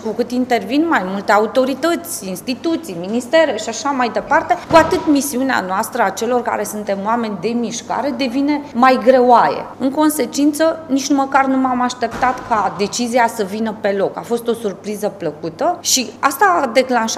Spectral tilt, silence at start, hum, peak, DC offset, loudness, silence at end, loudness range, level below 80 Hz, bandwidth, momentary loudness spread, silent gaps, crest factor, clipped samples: -3.5 dB/octave; 0 s; none; 0 dBFS; under 0.1%; -16 LUFS; 0 s; 4 LU; -52 dBFS; 15.5 kHz; 9 LU; none; 16 dB; under 0.1%